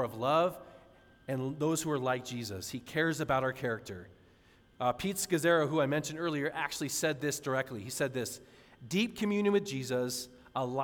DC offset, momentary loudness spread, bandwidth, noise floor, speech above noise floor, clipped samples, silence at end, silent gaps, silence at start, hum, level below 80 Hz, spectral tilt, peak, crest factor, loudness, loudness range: under 0.1%; 10 LU; 18.5 kHz; -63 dBFS; 30 dB; under 0.1%; 0 s; none; 0 s; none; -66 dBFS; -4.5 dB/octave; -16 dBFS; 18 dB; -33 LUFS; 3 LU